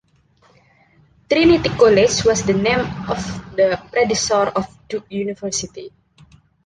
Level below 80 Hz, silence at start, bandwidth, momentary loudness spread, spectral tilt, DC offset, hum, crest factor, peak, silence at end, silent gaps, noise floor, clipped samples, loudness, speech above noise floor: -44 dBFS; 1.3 s; 10 kHz; 13 LU; -4 dB/octave; under 0.1%; none; 16 dB; -2 dBFS; 0.8 s; none; -56 dBFS; under 0.1%; -18 LUFS; 39 dB